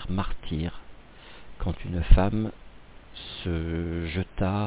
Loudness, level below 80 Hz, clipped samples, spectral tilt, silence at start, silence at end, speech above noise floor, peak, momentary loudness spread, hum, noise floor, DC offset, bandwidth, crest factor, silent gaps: -29 LUFS; -30 dBFS; under 0.1%; -11 dB/octave; 0 s; 0 s; 22 dB; -4 dBFS; 25 LU; none; -46 dBFS; under 0.1%; 4 kHz; 22 dB; none